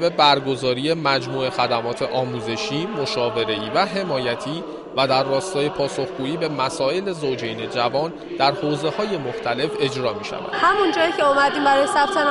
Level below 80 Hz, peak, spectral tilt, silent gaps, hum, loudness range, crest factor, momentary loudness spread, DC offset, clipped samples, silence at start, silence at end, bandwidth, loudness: -56 dBFS; -2 dBFS; -4.5 dB/octave; none; none; 3 LU; 18 dB; 8 LU; under 0.1%; under 0.1%; 0 s; 0 s; 11.5 kHz; -21 LUFS